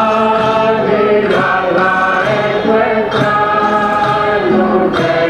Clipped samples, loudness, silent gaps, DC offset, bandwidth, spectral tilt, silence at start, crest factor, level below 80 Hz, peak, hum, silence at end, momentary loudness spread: under 0.1%; -12 LUFS; none; under 0.1%; 11 kHz; -6.5 dB/octave; 0 s; 12 dB; -44 dBFS; 0 dBFS; none; 0 s; 1 LU